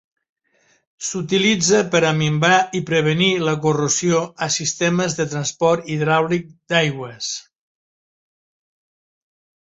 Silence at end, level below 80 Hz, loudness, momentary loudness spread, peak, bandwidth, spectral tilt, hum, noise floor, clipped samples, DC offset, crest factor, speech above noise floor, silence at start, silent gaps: 2.2 s; -58 dBFS; -18 LUFS; 10 LU; -2 dBFS; 8.2 kHz; -4 dB/octave; none; -61 dBFS; under 0.1%; under 0.1%; 18 dB; 43 dB; 1 s; none